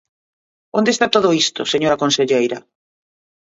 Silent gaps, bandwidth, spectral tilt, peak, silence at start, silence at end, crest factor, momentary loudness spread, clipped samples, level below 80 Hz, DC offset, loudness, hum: none; 8 kHz; -3.5 dB/octave; 0 dBFS; 0.75 s; 0.85 s; 18 dB; 8 LU; under 0.1%; -60 dBFS; under 0.1%; -16 LUFS; none